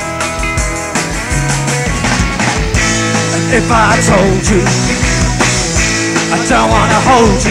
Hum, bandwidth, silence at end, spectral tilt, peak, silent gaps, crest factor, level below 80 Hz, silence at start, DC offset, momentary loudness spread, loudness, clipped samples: none; 16 kHz; 0 s; -4 dB/octave; 0 dBFS; none; 12 dB; -22 dBFS; 0 s; under 0.1%; 7 LU; -11 LUFS; under 0.1%